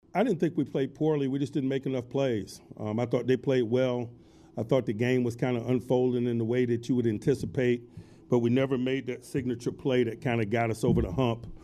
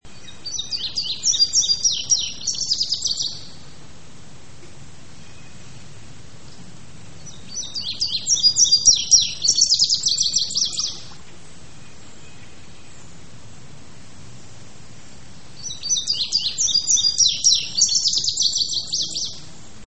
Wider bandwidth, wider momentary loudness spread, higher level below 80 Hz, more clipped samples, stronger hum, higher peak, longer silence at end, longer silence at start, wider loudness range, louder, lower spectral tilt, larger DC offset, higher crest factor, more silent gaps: first, 13 kHz vs 8.8 kHz; second, 7 LU vs 15 LU; about the same, -52 dBFS vs -52 dBFS; neither; neither; second, -12 dBFS vs -2 dBFS; about the same, 0.05 s vs 0 s; first, 0.15 s vs 0 s; second, 2 LU vs 15 LU; second, -29 LUFS vs -17 LUFS; first, -7.5 dB/octave vs 1 dB/octave; second, under 0.1% vs 2%; about the same, 16 dB vs 20 dB; neither